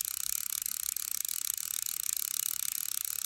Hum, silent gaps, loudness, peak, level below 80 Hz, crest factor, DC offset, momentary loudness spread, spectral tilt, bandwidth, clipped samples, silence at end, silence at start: none; none; -32 LUFS; -10 dBFS; -72 dBFS; 24 dB; under 0.1%; 2 LU; 3.5 dB/octave; 17 kHz; under 0.1%; 0 s; 0 s